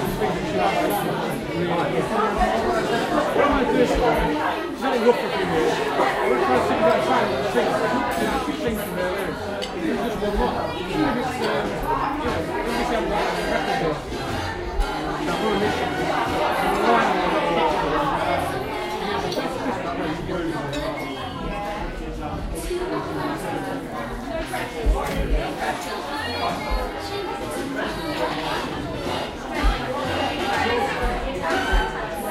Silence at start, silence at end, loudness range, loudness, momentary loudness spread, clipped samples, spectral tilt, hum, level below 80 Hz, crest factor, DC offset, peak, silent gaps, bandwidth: 0 s; 0 s; 7 LU; -23 LUFS; 9 LU; under 0.1%; -5 dB/octave; none; -34 dBFS; 18 dB; under 0.1%; -4 dBFS; none; 16 kHz